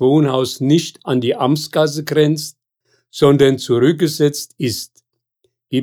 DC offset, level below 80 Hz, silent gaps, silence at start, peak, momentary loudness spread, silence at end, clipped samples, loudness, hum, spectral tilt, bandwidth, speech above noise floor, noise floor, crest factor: under 0.1%; -58 dBFS; none; 0 s; -2 dBFS; 9 LU; 0 s; under 0.1%; -16 LUFS; none; -6 dB/octave; 18.5 kHz; 52 dB; -67 dBFS; 16 dB